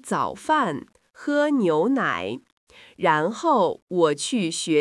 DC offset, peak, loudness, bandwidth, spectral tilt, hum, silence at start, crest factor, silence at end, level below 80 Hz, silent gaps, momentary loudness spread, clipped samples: under 0.1%; -6 dBFS; -23 LUFS; 12 kHz; -4.5 dB/octave; none; 0.05 s; 18 dB; 0 s; -70 dBFS; 2.52-2.67 s, 3.82-3.87 s; 8 LU; under 0.1%